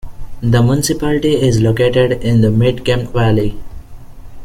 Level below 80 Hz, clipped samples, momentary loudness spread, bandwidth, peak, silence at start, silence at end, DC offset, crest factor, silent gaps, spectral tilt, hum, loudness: -30 dBFS; under 0.1%; 5 LU; 15.5 kHz; 0 dBFS; 0.05 s; 0 s; under 0.1%; 12 dB; none; -6.5 dB/octave; none; -14 LUFS